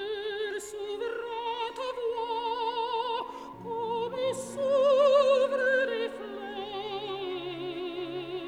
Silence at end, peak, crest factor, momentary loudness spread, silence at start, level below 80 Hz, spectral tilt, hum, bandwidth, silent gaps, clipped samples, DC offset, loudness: 0 s; -12 dBFS; 18 dB; 14 LU; 0 s; -68 dBFS; -3.5 dB/octave; none; 12.5 kHz; none; under 0.1%; under 0.1%; -30 LUFS